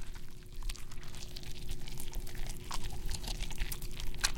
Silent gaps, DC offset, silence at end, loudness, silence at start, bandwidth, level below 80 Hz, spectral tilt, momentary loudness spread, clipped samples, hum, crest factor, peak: none; under 0.1%; 0 s; -43 LUFS; 0 s; 17 kHz; -40 dBFS; -2.5 dB/octave; 7 LU; under 0.1%; none; 24 dB; -12 dBFS